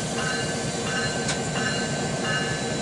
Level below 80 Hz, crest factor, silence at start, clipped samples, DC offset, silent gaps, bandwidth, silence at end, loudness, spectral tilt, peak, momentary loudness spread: -50 dBFS; 14 dB; 0 s; under 0.1%; under 0.1%; none; 11.5 kHz; 0 s; -26 LUFS; -3.5 dB/octave; -12 dBFS; 1 LU